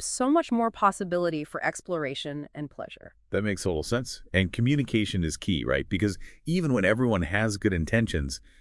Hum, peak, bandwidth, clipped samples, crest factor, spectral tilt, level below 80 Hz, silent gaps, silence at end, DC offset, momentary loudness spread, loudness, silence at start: none; -8 dBFS; 12 kHz; under 0.1%; 20 dB; -5.5 dB/octave; -46 dBFS; none; 0.2 s; under 0.1%; 12 LU; -27 LUFS; 0 s